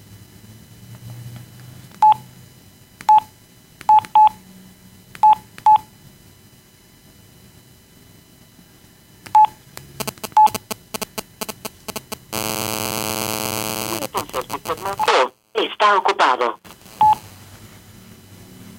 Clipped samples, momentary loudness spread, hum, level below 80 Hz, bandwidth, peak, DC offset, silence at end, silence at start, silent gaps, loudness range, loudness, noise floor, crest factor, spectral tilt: under 0.1%; 17 LU; none; -56 dBFS; 17 kHz; -2 dBFS; under 0.1%; 0.15 s; 0.15 s; none; 6 LU; -18 LUFS; -50 dBFS; 18 dB; -2.5 dB/octave